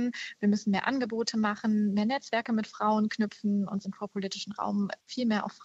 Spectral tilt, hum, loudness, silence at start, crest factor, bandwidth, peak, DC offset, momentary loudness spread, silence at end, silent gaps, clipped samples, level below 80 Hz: -5.5 dB/octave; none; -30 LUFS; 0 s; 16 dB; 8 kHz; -14 dBFS; under 0.1%; 7 LU; 0 s; none; under 0.1%; -72 dBFS